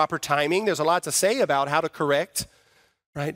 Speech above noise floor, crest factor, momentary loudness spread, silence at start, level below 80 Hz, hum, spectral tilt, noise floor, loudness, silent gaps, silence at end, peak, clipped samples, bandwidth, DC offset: 38 dB; 18 dB; 10 LU; 0 s; -62 dBFS; none; -3.5 dB/octave; -62 dBFS; -23 LUFS; 3.06-3.13 s; 0 s; -6 dBFS; under 0.1%; 16 kHz; under 0.1%